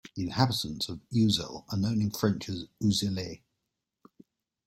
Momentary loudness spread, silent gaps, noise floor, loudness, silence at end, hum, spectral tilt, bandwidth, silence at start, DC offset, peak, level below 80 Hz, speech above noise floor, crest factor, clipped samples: 10 LU; none; -84 dBFS; -30 LUFS; 1.3 s; none; -5.5 dB/octave; 16.5 kHz; 0.15 s; under 0.1%; -8 dBFS; -58 dBFS; 55 dB; 24 dB; under 0.1%